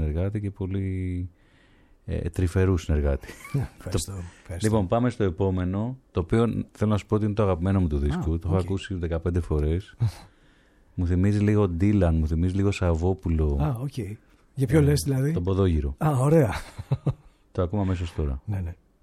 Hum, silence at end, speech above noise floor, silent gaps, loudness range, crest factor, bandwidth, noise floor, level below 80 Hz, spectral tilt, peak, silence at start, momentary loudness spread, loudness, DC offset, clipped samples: none; 0.3 s; 33 dB; none; 4 LU; 18 dB; 14 kHz; -58 dBFS; -36 dBFS; -7.5 dB/octave; -6 dBFS; 0 s; 11 LU; -26 LUFS; under 0.1%; under 0.1%